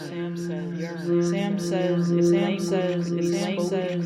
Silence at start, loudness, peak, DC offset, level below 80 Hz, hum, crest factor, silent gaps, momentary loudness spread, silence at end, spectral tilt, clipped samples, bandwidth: 0 s; -25 LUFS; -12 dBFS; under 0.1%; -66 dBFS; none; 12 dB; none; 9 LU; 0 s; -6.5 dB/octave; under 0.1%; 12.5 kHz